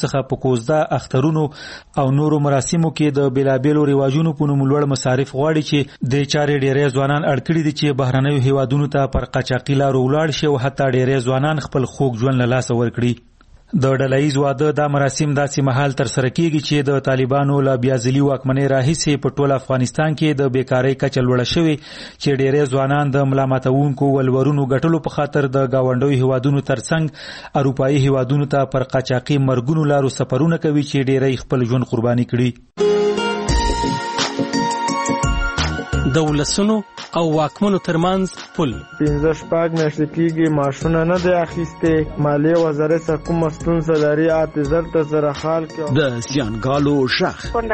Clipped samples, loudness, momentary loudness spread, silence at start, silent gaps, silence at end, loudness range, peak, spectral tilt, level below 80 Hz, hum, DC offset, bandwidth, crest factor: under 0.1%; -18 LUFS; 4 LU; 0 s; none; 0 s; 2 LU; -4 dBFS; -6.5 dB/octave; -36 dBFS; none; under 0.1%; 8.8 kHz; 14 dB